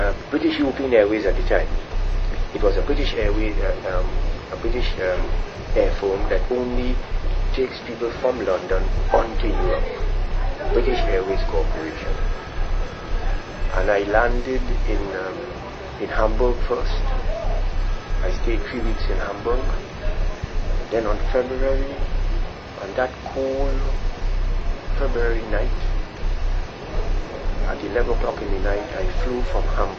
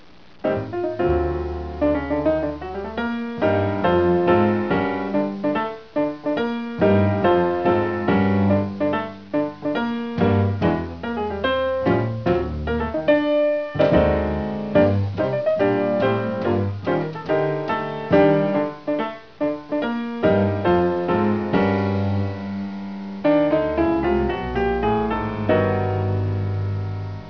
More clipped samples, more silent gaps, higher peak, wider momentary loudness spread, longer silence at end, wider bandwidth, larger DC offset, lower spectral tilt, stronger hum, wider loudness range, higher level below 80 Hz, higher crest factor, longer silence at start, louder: neither; neither; about the same, -2 dBFS vs -4 dBFS; about the same, 8 LU vs 8 LU; about the same, 0 s vs 0 s; first, 6.6 kHz vs 5.4 kHz; second, under 0.1% vs 0.4%; second, -6.5 dB/octave vs -9 dB/octave; neither; about the same, 4 LU vs 2 LU; first, -22 dBFS vs -40 dBFS; about the same, 18 dB vs 18 dB; second, 0 s vs 0.45 s; second, -24 LUFS vs -21 LUFS